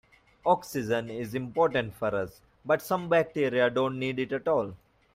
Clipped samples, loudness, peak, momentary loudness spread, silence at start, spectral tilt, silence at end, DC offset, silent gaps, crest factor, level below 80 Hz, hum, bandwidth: under 0.1%; -28 LUFS; -10 dBFS; 9 LU; 0.45 s; -6 dB/octave; 0.4 s; under 0.1%; none; 18 dB; -62 dBFS; none; 16 kHz